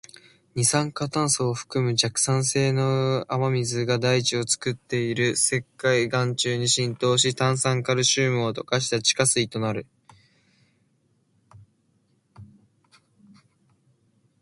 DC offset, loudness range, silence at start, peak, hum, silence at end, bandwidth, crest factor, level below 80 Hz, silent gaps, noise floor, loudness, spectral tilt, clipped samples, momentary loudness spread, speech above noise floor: under 0.1%; 5 LU; 0.55 s; -6 dBFS; none; 1.95 s; 11.5 kHz; 20 dB; -62 dBFS; none; -67 dBFS; -23 LUFS; -3.5 dB/octave; under 0.1%; 6 LU; 44 dB